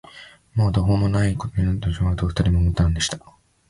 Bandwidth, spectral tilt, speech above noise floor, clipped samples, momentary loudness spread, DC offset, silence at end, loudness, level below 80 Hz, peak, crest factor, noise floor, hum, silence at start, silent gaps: 11.5 kHz; -6 dB/octave; 26 dB; under 0.1%; 5 LU; under 0.1%; 0.5 s; -21 LUFS; -30 dBFS; -6 dBFS; 14 dB; -45 dBFS; none; 0.15 s; none